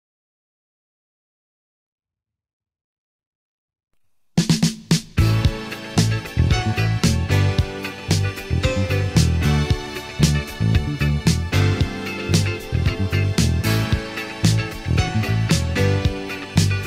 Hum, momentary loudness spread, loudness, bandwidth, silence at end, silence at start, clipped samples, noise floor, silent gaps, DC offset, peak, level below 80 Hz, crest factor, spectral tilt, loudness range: none; 5 LU; -20 LUFS; 16 kHz; 0 s; 4.35 s; under 0.1%; -87 dBFS; none; 0.1%; -4 dBFS; -30 dBFS; 18 dB; -5.5 dB/octave; 3 LU